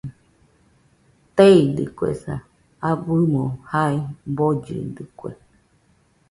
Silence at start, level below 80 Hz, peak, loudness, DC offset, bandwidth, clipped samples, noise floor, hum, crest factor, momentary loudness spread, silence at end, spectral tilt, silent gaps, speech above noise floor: 0.05 s; -52 dBFS; -2 dBFS; -20 LUFS; under 0.1%; 11.5 kHz; under 0.1%; -60 dBFS; none; 20 dB; 21 LU; 0.95 s; -8 dB/octave; none; 41 dB